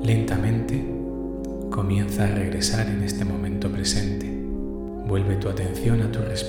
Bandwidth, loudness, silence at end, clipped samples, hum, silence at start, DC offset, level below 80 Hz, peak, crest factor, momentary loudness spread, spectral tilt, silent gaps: 17 kHz; -25 LUFS; 0 s; under 0.1%; none; 0 s; under 0.1%; -36 dBFS; -8 dBFS; 16 dB; 8 LU; -5.5 dB/octave; none